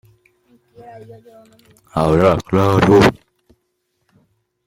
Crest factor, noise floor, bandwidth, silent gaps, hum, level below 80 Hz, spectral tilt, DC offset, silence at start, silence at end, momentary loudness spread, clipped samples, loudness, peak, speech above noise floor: 18 dB; -69 dBFS; 16.5 kHz; none; none; -42 dBFS; -7 dB/octave; under 0.1%; 1.95 s; 1.55 s; 7 LU; under 0.1%; -14 LUFS; 0 dBFS; 54 dB